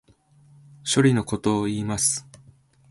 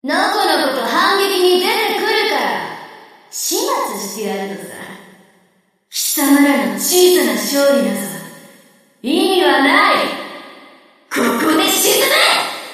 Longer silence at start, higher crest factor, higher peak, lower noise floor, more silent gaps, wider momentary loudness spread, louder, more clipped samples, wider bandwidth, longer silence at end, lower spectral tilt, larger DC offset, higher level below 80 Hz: first, 0.85 s vs 0.05 s; about the same, 18 dB vs 16 dB; second, -6 dBFS vs 0 dBFS; about the same, -56 dBFS vs -58 dBFS; neither; second, 9 LU vs 17 LU; second, -23 LUFS vs -14 LUFS; neither; second, 12 kHz vs 15.5 kHz; first, 0.7 s vs 0 s; first, -4.5 dB/octave vs -2 dB/octave; neither; first, -54 dBFS vs -70 dBFS